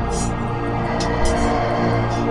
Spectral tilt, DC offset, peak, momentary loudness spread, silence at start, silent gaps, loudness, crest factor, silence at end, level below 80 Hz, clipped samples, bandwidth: -6 dB/octave; under 0.1%; -6 dBFS; 4 LU; 0 s; none; -21 LUFS; 14 dB; 0 s; -28 dBFS; under 0.1%; 11.5 kHz